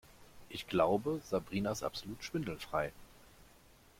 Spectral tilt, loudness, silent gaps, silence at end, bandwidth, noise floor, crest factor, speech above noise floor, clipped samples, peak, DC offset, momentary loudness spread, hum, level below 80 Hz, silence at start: -5.5 dB/octave; -37 LUFS; none; 0.55 s; 16.5 kHz; -62 dBFS; 22 dB; 26 dB; under 0.1%; -16 dBFS; under 0.1%; 11 LU; none; -62 dBFS; 0.1 s